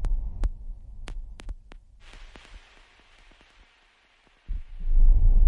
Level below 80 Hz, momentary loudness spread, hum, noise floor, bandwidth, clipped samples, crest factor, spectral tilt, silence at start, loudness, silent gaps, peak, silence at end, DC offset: -24 dBFS; 27 LU; none; -62 dBFS; 3.8 kHz; under 0.1%; 16 dB; -7 dB/octave; 0 s; -31 LUFS; none; -8 dBFS; 0 s; under 0.1%